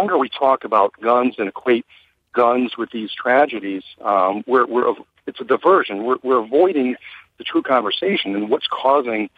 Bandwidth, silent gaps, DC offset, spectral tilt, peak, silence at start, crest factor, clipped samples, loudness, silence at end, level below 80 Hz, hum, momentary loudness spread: 5 kHz; none; under 0.1%; -7 dB/octave; -2 dBFS; 0 s; 16 dB; under 0.1%; -18 LUFS; 0.1 s; -70 dBFS; none; 10 LU